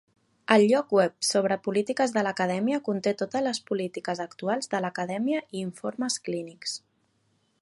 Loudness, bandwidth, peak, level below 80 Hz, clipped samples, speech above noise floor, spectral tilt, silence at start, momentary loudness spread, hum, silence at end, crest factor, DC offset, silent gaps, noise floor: -27 LUFS; 11.5 kHz; -2 dBFS; -76 dBFS; under 0.1%; 44 dB; -4 dB/octave; 0.5 s; 12 LU; none; 0.85 s; 24 dB; under 0.1%; none; -70 dBFS